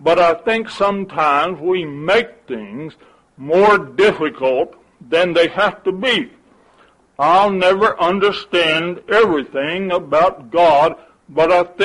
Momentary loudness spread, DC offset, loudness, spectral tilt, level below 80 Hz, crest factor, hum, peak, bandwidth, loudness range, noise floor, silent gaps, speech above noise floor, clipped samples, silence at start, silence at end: 12 LU; under 0.1%; -16 LUFS; -5 dB/octave; -52 dBFS; 14 dB; none; -2 dBFS; 11.5 kHz; 2 LU; -52 dBFS; none; 37 dB; under 0.1%; 0 s; 0 s